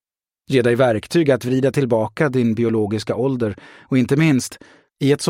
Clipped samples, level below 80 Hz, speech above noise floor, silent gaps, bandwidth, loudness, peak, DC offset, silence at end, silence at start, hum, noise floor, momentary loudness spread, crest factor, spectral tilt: under 0.1%; -56 dBFS; 35 dB; none; 16 kHz; -19 LUFS; -4 dBFS; under 0.1%; 0 s; 0.5 s; none; -53 dBFS; 6 LU; 14 dB; -6.5 dB/octave